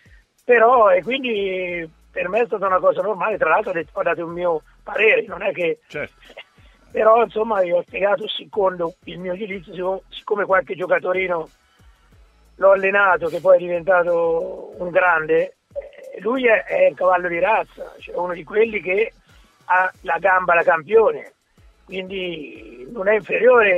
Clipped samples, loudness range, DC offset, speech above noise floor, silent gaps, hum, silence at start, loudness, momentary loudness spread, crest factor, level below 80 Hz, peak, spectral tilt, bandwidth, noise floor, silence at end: under 0.1%; 4 LU; under 0.1%; 35 dB; none; none; 0.5 s; -19 LUFS; 15 LU; 18 dB; -54 dBFS; -2 dBFS; -6 dB/octave; 7.4 kHz; -53 dBFS; 0 s